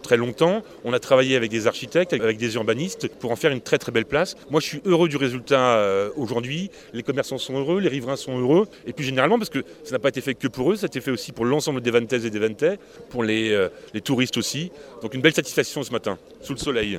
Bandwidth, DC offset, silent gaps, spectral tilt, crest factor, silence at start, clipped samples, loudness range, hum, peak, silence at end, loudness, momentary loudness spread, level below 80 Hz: 16 kHz; under 0.1%; none; -5 dB/octave; 20 dB; 0 s; under 0.1%; 2 LU; none; -2 dBFS; 0 s; -23 LUFS; 10 LU; -56 dBFS